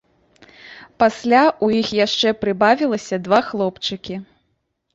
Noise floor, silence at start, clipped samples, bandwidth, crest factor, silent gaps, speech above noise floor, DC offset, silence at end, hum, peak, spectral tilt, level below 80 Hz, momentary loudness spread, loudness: -70 dBFS; 0.65 s; under 0.1%; 8 kHz; 18 dB; none; 52 dB; under 0.1%; 0.7 s; none; -2 dBFS; -4.5 dB/octave; -56 dBFS; 11 LU; -18 LUFS